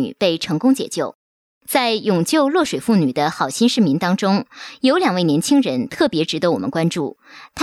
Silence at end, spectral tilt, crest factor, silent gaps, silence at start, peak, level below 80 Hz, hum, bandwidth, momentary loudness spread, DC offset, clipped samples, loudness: 0 s; -5 dB/octave; 16 dB; 1.15-1.61 s; 0 s; -2 dBFS; -60 dBFS; none; 15 kHz; 6 LU; under 0.1%; under 0.1%; -18 LUFS